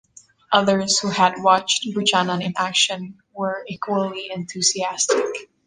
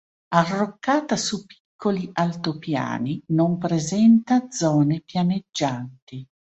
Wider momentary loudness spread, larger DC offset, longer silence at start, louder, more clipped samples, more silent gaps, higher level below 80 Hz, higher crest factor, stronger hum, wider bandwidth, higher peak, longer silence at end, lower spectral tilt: about the same, 11 LU vs 10 LU; neither; first, 0.5 s vs 0.3 s; about the same, -20 LUFS vs -22 LUFS; neither; second, none vs 1.60-1.79 s, 6.02-6.07 s; about the same, -64 dBFS vs -62 dBFS; about the same, 20 dB vs 20 dB; neither; first, 10 kHz vs 8.2 kHz; about the same, -2 dBFS vs -4 dBFS; about the same, 0.25 s vs 0.25 s; second, -2.5 dB/octave vs -5.5 dB/octave